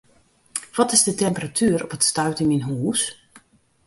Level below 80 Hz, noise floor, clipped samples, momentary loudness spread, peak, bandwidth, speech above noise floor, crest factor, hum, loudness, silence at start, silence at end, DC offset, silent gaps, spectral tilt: -58 dBFS; -58 dBFS; under 0.1%; 11 LU; -2 dBFS; 12 kHz; 37 dB; 20 dB; none; -21 LUFS; 0.55 s; 0.5 s; under 0.1%; none; -3.5 dB/octave